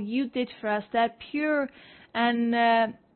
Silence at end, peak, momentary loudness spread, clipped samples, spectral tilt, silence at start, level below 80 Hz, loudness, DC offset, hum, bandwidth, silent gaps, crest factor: 0.25 s; -12 dBFS; 8 LU; under 0.1%; -9 dB/octave; 0 s; -68 dBFS; -27 LUFS; under 0.1%; none; 4.4 kHz; none; 14 dB